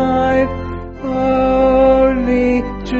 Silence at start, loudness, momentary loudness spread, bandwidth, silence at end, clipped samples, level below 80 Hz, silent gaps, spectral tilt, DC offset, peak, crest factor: 0 s; -14 LUFS; 13 LU; 7.6 kHz; 0 s; under 0.1%; -30 dBFS; none; -6 dB/octave; under 0.1%; -2 dBFS; 12 dB